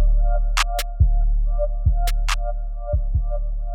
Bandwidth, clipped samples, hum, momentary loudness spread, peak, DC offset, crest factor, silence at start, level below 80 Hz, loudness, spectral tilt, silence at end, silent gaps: 16 kHz; under 0.1%; none; 6 LU; -6 dBFS; under 0.1%; 14 dB; 0 s; -20 dBFS; -24 LUFS; -4 dB/octave; 0 s; none